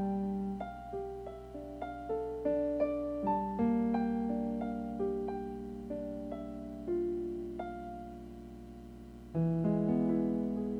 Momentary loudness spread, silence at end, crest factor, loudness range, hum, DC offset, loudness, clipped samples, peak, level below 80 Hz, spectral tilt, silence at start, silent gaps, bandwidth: 15 LU; 0 s; 16 dB; 6 LU; 60 Hz at -55 dBFS; under 0.1%; -36 LUFS; under 0.1%; -20 dBFS; -54 dBFS; -10 dB/octave; 0 s; none; 8.4 kHz